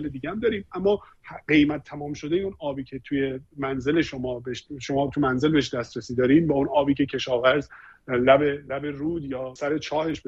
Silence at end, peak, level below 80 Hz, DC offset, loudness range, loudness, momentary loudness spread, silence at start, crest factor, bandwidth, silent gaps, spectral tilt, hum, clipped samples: 0.1 s; -4 dBFS; -52 dBFS; under 0.1%; 5 LU; -25 LUFS; 13 LU; 0 s; 20 dB; 7.8 kHz; none; -6.5 dB/octave; none; under 0.1%